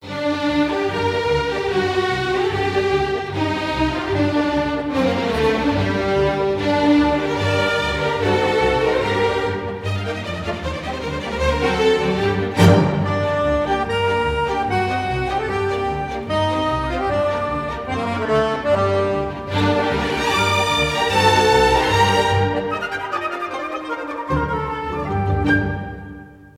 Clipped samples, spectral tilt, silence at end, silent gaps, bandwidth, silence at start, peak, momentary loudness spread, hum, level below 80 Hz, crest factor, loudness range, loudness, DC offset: under 0.1%; -5.5 dB/octave; 0.1 s; none; 15.5 kHz; 0 s; -2 dBFS; 9 LU; none; -36 dBFS; 18 dB; 5 LU; -19 LUFS; under 0.1%